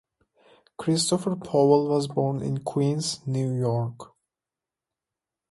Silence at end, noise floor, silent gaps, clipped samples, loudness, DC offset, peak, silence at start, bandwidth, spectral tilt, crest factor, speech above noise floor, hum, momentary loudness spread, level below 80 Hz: 1.45 s; -89 dBFS; none; under 0.1%; -25 LUFS; under 0.1%; -6 dBFS; 0.8 s; 11.5 kHz; -6 dB/octave; 20 dB; 65 dB; none; 9 LU; -64 dBFS